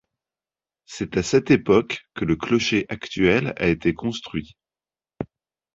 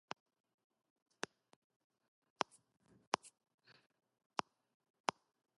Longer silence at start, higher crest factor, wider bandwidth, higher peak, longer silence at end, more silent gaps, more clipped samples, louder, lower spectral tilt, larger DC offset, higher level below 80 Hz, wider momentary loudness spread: second, 0.9 s vs 3.25 s; second, 20 dB vs 36 dB; second, 7.8 kHz vs 11.5 kHz; first, -4 dBFS vs -16 dBFS; second, 0.5 s vs 2.3 s; neither; neither; first, -22 LUFS vs -46 LUFS; first, -5.5 dB/octave vs -2 dB/octave; neither; first, -48 dBFS vs under -90 dBFS; first, 17 LU vs 10 LU